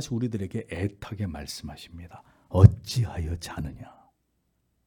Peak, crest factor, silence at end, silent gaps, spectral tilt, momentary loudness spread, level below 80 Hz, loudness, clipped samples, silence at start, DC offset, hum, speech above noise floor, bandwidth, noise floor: 0 dBFS; 26 dB; 1.05 s; none; -7 dB/octave; 24 LU; -46 dBFS; -26 LUFS; under 0.1%; 0 s; under 0.1%; none; 48 dB; 13.5 kHz; -73 dBFS